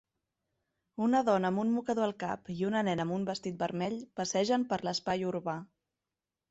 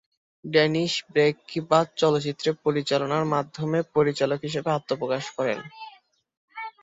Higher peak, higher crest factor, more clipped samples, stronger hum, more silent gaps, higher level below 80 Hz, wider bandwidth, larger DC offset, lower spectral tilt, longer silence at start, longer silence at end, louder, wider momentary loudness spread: second, -16 dBFS vs -6 dBFS; about the same, 18 dB vs 20 dB; neither; neither; second, none vs 6.37-6.48 s; about the same, -70 dBFS vs -66 dBFS; about the same, 8.2 kHz vs 8 kHz; neither; about the same, -5.5 dB/octave vs -5.5 dB/octave; first, 1 s vs 0.45 s; first, 0.85 s vs 0.1 s; second, -32 LUFS vs -25 LUFS; second, 8 LU vs 16 LU